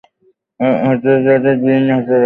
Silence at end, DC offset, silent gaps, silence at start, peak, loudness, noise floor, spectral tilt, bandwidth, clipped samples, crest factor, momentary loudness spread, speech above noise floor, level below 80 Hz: 0 s; under 0.1%; none; 0.6 s; -2 dBFS; -13 LUFS; -57 dBFS; -10.5 dB/octave; 4.1 kHz; under 0.1%; 12 dB; 4 LU; 45 dB; -58 dBFS